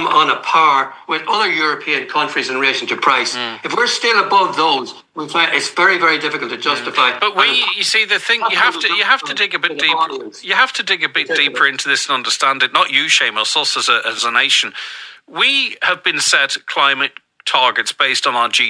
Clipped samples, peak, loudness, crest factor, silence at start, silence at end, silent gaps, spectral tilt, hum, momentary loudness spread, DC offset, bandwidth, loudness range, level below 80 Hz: under 0.1%; 0 dBFS; -14 LUFS; 16 dB; 0 s; 0 s; none; -0.5 dB/octave; none; 7 LU; under 0.1%; 10.5 kHz; 2 LU; -78 dBFS